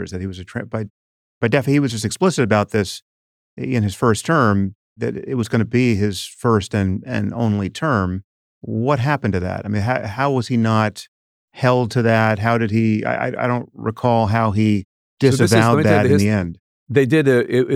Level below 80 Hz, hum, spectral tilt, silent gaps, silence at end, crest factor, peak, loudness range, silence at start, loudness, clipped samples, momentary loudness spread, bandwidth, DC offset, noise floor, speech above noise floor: -56 dBFS; none; -6.5 dB/octave; 0.90-1.41 s, 3.02-3.57 s, 4.75-4.96 s, 8.24-8.61 s, 11.08-11.48 s, 14.85-15.17 s, 16.59-16.86 s; 0 s; 18 dB; 0 dBFS; 4 LU; 0 s; -18 LUFS; under 0.1%; 12 LU; 14.5 kHz; under 0.1%; under -90 dBFS; over 72 dB